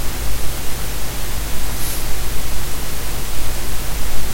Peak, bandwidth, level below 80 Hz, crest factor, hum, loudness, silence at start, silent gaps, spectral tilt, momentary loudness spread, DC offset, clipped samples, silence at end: -2 dBFS; 16 kHz; -24 dBFS; 10 dB; none; -25 LUFS; 0 s; none; -3 dB/octave; 2 LU; under 0.1%; under 0.1%; 0 s